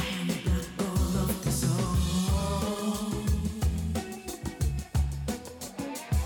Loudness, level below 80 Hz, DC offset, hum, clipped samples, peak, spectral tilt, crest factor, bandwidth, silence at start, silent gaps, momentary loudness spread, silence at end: -30 LUFS; -34 dBFS; under 0.1%; none; under 0.1%; -16 dBFS; -5.5 dB/octave; 14 dB; 19 kHz; 0 s; none; 9 LU; 0 s